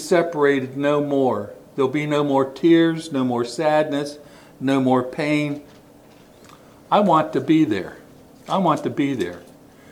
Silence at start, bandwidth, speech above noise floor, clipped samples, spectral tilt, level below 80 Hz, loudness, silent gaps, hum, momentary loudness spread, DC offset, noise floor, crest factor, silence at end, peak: 0 s; 15 kHz; 29 dB; under 0.1%; -6.5 dB/octave; -62 dBFS; -20 LUFS; none; none; 11 LU; under 0.1%; -48 dBFS; 18 dB; 0.5 s; -2 dBFS